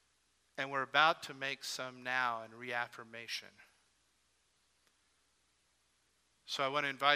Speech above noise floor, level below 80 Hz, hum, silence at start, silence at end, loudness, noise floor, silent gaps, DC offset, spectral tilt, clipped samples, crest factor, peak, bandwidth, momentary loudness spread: 40 dB; -88 dBFS; none; 0.55 s; 0 s; -36 LUFS; -76 dBFS; none; under 0.1%; -2 dB/octave; under 0.1%; 28 dB; -12 dBFS; 14 kHz; 14 LU